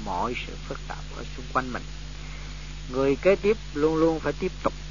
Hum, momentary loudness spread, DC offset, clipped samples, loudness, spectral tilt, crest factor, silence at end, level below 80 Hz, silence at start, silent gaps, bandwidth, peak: 50 Hz at -40 dBFS; 17 LU; 0.7%; under 0.1%; -27 LUFS; -6 dB/octave; 18 dB; 0 s; -38 dBFS; 0 s; none; 7.4 kHz; -8 dBFS